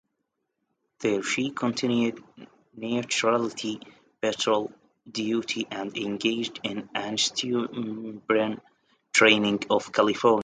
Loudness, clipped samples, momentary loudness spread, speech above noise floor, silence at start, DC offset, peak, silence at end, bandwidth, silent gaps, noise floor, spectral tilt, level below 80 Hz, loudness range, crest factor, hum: -26 LUFS; under 0.1%; 12 LU; 54 dB; 1 s; under 0.1%; -4 dBFS; 0 s; 9.6 kHz; none; -80 dBFS; -3.5 dB/octave; -70 dBFS; 5 LU; 22 dB; none